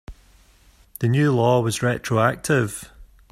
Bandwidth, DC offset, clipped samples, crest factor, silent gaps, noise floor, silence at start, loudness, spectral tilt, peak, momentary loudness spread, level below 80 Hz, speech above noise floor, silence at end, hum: 15.5 kHz; under 0.1%; under 0.1%; 18 dB; none; -54 dBFS; 0.1 s; -21 LUFS; -6 dB/octave; -6 dBFS; 8 LU; -50 dBFS; 34 dB; 0.3 s; none